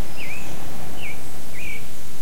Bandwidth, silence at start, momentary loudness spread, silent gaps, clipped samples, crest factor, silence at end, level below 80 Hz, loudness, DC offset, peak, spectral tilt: 16.5 kHz; 0 s; 4 LU; none; under 0.1%; 14 dB; 0 s; -46 dBFS; -34 LUFS; 30%; -10 dBFS; -4 dB/octave